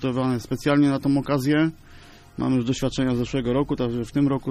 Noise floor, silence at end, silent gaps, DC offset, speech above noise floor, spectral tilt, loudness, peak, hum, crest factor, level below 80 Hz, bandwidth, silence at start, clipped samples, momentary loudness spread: -46 dBFS; 0 s; none; under 0.1%; 24 dB; -7 dB/octave; -23 LUFS; -8 dBFS; none; 14 dB; -44 dBFS; 14 kHz; 0 s; under 0.1%; 6 LU